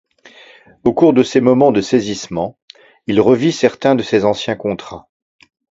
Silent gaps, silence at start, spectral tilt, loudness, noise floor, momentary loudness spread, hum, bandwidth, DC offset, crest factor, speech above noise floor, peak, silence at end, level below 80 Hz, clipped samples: 2.62-2.68 s; 0.85 s; -6 dB/octave; -15 LUFS; -43 dBFS; 14 LU; none; 8 kHz; under 0.1%; 16 dB; 30 dB; 0 dBFS; 0.8 s; -50 dBFS; under 0.1%